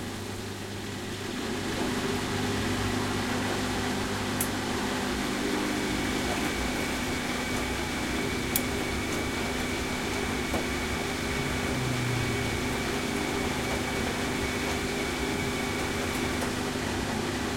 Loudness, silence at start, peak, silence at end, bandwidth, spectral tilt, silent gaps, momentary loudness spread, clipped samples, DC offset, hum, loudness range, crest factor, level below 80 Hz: -29 LUFS; 0 s; -6 dBFS; 0 s; 16.5 kHz; -4 dB/octave; none; 2 LU; under 0.1%; under 0.1%; none; 1 LU; 24 dB; -44 dBFS